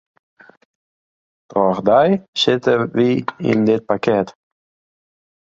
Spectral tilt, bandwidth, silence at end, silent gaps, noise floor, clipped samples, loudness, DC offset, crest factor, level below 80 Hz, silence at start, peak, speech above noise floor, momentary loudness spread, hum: -6 dB/octave; 7.8 kHz; 1.25 s; 2.28-2.33 s; under -90 dBFS; under 0.1%; -17 LUFS; under 0.1%; 18 dB; -56 dBFS; 1.5 s; -2 dBFS; over 74 dB; 6 LU; none